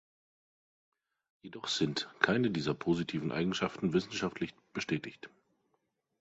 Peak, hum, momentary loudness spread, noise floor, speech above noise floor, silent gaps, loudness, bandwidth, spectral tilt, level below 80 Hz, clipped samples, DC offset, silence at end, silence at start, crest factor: -8 dBFS; none; 12 LU; -80 dBFS; 46 dB; none; -34 LUFS; 8.2 kHz; -5 dB/octave; -66 dBFS; under 0.1%; under 0.1%; 0.95 s; 1.45 s; 28 dB